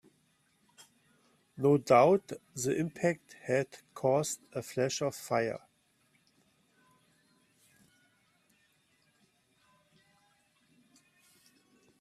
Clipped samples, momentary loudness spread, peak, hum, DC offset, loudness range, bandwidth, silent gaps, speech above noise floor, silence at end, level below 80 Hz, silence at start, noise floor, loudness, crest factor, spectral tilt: under 0.1%; 16 LU; -12 dBFS; none; under 0.1%; 10 LU; 15.5 kHz; none; 42 dB; 6.45 s; -76 dBFS; 1.55 s; -72 dBFS; -31 LUFS; 24 dB; -5 dB/octave